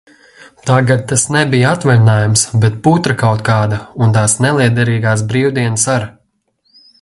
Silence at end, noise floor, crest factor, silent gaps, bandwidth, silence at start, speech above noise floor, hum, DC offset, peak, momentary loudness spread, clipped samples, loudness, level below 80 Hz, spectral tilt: 0.9 s; -61 dBFS; 12 dB; none; 11.5 kHz; 0.65 s; 49 dB; none; under 0.1%; 0 dBFS; 4 LU; under 0.1%; -12 LUFS; -44 dBFS; -5 dB/octave